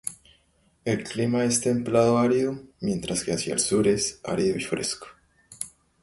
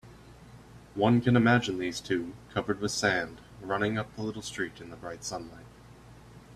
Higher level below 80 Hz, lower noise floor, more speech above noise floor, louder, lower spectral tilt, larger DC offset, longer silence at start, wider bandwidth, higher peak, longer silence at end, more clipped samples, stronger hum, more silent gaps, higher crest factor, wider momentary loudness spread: about the same, -56 dBFS vs -58 dBFS; first, -65 dBFS vs -52 dBFS; first, 40 dB vs 23 dB; first, -25 LUFS vs -29 LUFS; about the same, -4.5 dB/octave vs -5 dB/octave; neither; about the same, 0.05 s vs 0.05 s; second, 12 kHz vs 13.5 kHz; about the same, -8 dBFS vs -10 dBFS; first, 0.35 s vs 0 s; neither; neither; neither; about the same, 18 dB vs 20 dB; second, 15 LU vs 18 LU